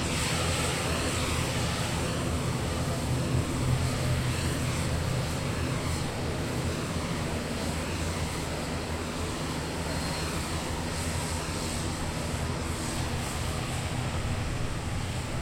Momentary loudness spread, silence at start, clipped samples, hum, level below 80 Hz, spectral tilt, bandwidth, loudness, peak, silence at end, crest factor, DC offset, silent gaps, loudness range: 4 LU; 0 s; under 0.1%; none; -40 dBFS; -4.5 dB/octave; 16.5 kHz; -31 LUFS; -16 dBFS; 0 s; 14 dB; under 0.1%; none; 3 LU